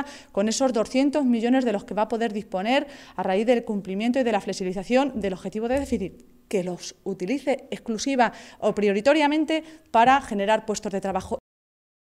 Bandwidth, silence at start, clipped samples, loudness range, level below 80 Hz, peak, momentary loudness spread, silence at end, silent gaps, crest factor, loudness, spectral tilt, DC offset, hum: 13.5 kHz; 0 s; under 0.1%; 5 LU; -54 dBFS; -8 dBFS; 10 LU; 0.75 s; none; 18 dB; -24 LUFS; -4.5 dB/octave; under 0.1%; none